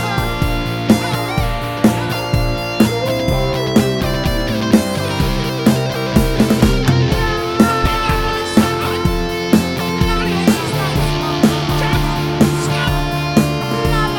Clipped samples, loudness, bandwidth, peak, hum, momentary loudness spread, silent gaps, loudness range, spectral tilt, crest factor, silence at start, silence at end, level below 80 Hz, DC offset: under 0.1%; -16 LUFS; 19 kHz; 0 dBFS; none; 4 LU; none; 2 LU; -5.5 dB/octave; 16 dB; 0 s; 0 s; -26 dBFS; under 0.1%